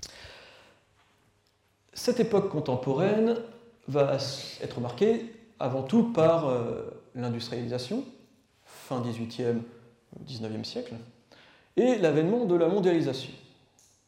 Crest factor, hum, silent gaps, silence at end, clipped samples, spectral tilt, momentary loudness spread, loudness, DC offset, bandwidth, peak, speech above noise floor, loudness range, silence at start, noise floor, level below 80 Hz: 18 dB; none; none; 0.7 s; under 0.1%; -6.5 dB/octave; 19 LU; -28 LUFS; under 0.1%; 16.5 kHz; -12 dBFS; 42 dB; 8 LU; 0 s; -69 dBFS; -68 dBFS